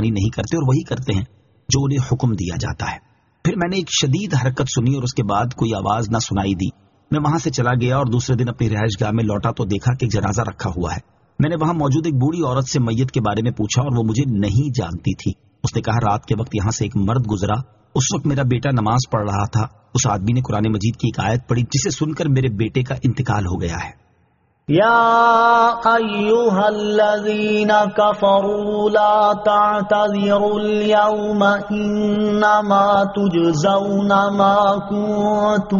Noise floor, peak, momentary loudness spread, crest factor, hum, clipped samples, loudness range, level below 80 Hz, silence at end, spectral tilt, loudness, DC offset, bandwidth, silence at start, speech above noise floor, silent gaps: -60 dBFS; -2 dBFS; 9 LU; 16 dB; none; under 0.1%; 5 LU; -42 dBFS; 0 s; -5.5 dB/octave; -18 LUFS; under 0.1%; 7.4 kHz; 0 s; 43 dB; none